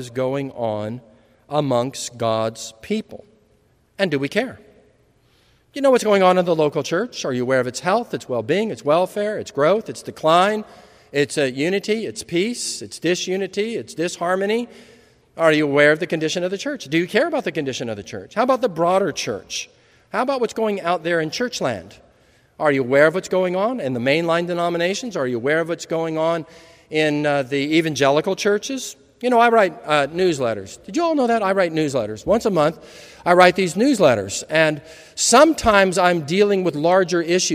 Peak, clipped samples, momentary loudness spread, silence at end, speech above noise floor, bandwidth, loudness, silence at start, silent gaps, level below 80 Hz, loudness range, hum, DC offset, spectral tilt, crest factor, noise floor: 0 dBFS; under 0.1%; 11 LU; 0 s; 40 dB; 15.5 kHz; -19 LUFS; 0 s; none; -54 dBFS; 7 LU; none; under 0.1%; -4.5 dB/octave; 20 dB; -59 dBFS